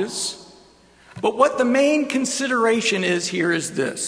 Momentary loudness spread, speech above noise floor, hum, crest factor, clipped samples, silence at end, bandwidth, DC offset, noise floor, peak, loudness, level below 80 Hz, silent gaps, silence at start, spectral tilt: 8 LU; 31 dB; none; 18 dB; under 0.1%; 0 s; 11 kHz; under 0.1%; -51 dBFS; -2 dBFS; -20 LUFS; -64 dBFS; none; 0 s; -3.5 dB/octave